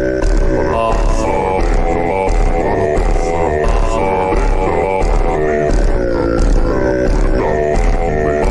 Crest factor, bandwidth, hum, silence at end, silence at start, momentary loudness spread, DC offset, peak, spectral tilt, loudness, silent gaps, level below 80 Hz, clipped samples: 8 dB; 10 kHz; none; 0 s; 0 s; 1 LU; under 0.1%; -4 dBFS; -7 dB/octave; -15 LUFS; none; -16 dBFS; under 0.1%